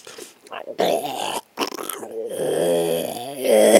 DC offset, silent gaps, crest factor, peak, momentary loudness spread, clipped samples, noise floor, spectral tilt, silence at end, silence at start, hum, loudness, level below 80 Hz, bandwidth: under 0.1%; none; 22 dB; 0 dBFS; 16 LU; under 0.1%; -41 dBFS; -3 dB/octave; 0 s; 0.05 s; none; -23 LUFS; -70 dBFS; 17 kHz